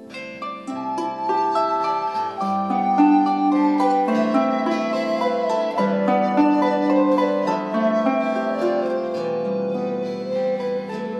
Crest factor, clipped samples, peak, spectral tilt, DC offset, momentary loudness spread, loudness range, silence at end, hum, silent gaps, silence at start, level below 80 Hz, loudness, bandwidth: 16 dB; under 0.1%; -6 dBFS; -7 dB/octave; under 0.1%; 8 LU; 3 LU; 0 s; none; none; 0 s; -70 dBFS; -21 LUFS; 9.2 kHz